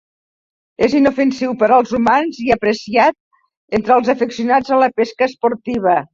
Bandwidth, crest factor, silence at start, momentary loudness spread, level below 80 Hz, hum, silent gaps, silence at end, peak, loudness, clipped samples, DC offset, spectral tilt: 7.6 kHz; 14 dB; 0.8 s; 5 LU; -50 dBFS; none; 3.20-3.31 s, 3.57-3.68 s; 0.1 s; -2 dBFS; -15 LUFS; under 0.1%; under 0.1%; -5.5 dB/octave